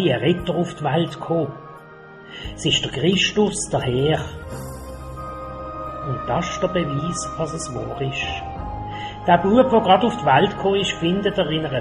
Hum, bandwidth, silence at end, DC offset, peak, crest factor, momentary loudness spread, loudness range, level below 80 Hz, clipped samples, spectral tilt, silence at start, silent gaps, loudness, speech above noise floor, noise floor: none; 14 kHz; 0 s; under 0.1%; -2 dBFS; 20 dB; 17 LU; 7 LU; -42 dBFS; under 0.1%; -5 dB/octave; 0 s; none; -21 LUFS; 22 dB; -42 dBFS